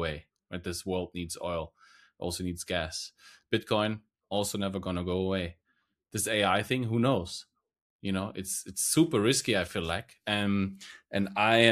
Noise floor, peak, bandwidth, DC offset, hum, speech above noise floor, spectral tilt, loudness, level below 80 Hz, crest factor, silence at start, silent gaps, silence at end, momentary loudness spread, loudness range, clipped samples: -77 dBFS; -6 dBFS; 15 kHz; under 0.1%; none; 47 dB; -4 dB/octave; -30 LUFS; -56 dBFS; 26 dB; 0 s; 7.81-7.99 s; 0 s; 14 LU; 5 LU; under 0.1%